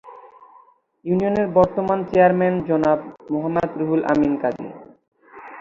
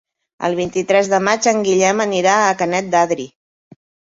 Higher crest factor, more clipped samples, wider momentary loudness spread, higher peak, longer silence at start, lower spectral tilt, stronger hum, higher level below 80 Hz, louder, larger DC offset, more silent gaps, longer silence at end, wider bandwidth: about the same, 18 dB vs 16 dB; neither; first, 11 LU vs 7 LU; about the same, -2 dBFS vs 0 dBFS; second, 0.05 s vs 0.4 s; first, -9 dB/octave vs -3.5 dB/octave; neither; first, -52 dBFS vs -58 dBFS; second, -20 LUFS vs -16 LUFS; neither; first, 5.08-5.12 s vs none; second, 0 s vs 0.85 s; about the same, 7.4 kHz vs 8 kHz